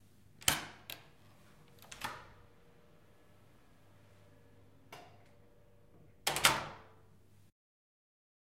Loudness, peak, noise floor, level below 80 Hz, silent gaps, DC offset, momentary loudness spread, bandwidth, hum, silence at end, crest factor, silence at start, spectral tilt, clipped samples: -35 LUFS; -8 dBFS; -65 dBFS; -66 dBFS; none; under 0.1%; 27 LU; 16 kHz; none; 1.65 s; 36 dB; 0.4 s; -1 dB/octave; under 0.1%